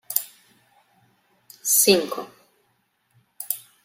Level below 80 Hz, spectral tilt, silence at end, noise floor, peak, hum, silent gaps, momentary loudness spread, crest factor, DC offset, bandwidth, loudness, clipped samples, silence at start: -74 dBFS; -1.5 dB/octave; 0.25 s; -69 dBFS; -2 dBFS; none; none; 24 LU; 26 dB; under 0.1%; 16.5 kHz; -21 LUFS; under 0.1%; 0.1 s